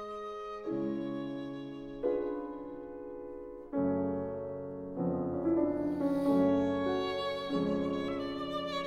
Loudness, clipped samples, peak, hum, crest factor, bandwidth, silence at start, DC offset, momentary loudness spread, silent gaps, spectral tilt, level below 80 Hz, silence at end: -34 LUFS; under 0.1%; -18 dBFS; none; 16 dB; 9.8 kHz; 0 s; under 0.1%; 14 LU; none; -7.5 dB/octave; -62 dBFS; 0 s